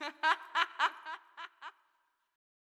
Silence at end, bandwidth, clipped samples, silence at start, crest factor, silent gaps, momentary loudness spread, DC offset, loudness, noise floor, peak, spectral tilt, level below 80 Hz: 1.05 s; 13.5 kHz; under 0.1%; 0 s; 24 dB; none; 19 LU; under 0.1%; -32 LUFS; -77 dBFS; -14 dBFS; 1.5 dB/octave; under -90 dBFS